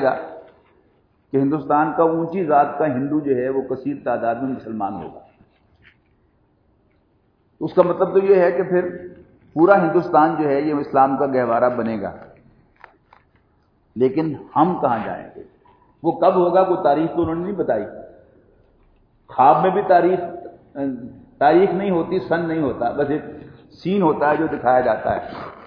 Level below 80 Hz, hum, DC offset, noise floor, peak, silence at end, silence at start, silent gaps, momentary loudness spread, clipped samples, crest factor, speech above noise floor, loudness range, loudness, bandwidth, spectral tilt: -56 dBFS; none; under 0.1%; -61 dBFS; 0 dBFS; 0 s; 0 s; none; 16 LU; under 0.1%; 20 dB; 43 dB; 7 LU; -19 LUFS; 5.4 kHz; -10.5 dB/octave